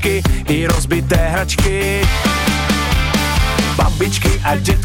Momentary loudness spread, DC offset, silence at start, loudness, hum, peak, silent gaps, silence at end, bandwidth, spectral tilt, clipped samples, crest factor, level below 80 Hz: 1 LU; under 0.1%; 0 s; -15 LUFS; none; -2 dBFS; none; 0 s; 17 kHz; -4.5 dB/octave; under 0.1%; 14 dB; -20 dBFS